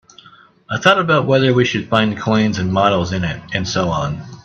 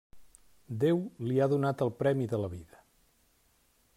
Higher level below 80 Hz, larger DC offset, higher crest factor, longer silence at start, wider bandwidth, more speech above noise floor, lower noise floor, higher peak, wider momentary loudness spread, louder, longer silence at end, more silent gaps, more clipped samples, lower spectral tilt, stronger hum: first, -46 dBFS vs -68 dBFS; neither; about the same, 16 dB vs 16 dB; first, 0.7 s vs 0.15 s; second, 8.2 kHz vs 15 kHz; second, 30 dB vs 39 dB; second, -46 dBFS vs -69 dBFS; first, 0 dBFS vs -16 dBFS; second, 8 LU vs 11 LU; first, -16 LUFS vs -30 LUFS; second, 0.05 s vs 1.3 s; neither; neither; second, -5.5 dB/octave vs -8.5 dB/octave; neither